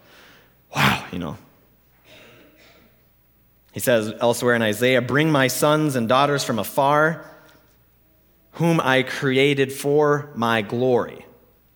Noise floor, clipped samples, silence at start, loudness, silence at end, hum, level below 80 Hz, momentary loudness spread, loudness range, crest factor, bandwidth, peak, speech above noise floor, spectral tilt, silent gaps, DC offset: -58 dBFS; under 0.1%; 0.7 s; -20 LUFS; 0.55 s; none; -58 dBFS; 10 LU; 9 LU; 20 dB; 20 kHz; -2 dBFS; 39 dB; -5 dB/octave; none; under 0.1%